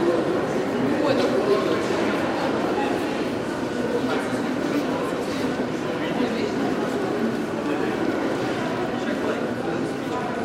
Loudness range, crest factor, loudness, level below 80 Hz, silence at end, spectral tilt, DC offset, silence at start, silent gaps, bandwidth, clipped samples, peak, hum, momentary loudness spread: 2 LU; 14 dB; -24 LUFS; -56 dBFS; 0 s; -5.5 dB/octave; under 0.1%; 0 s; none; 16 kHz; under 0.1%; -10 dBFS; none; 5 LU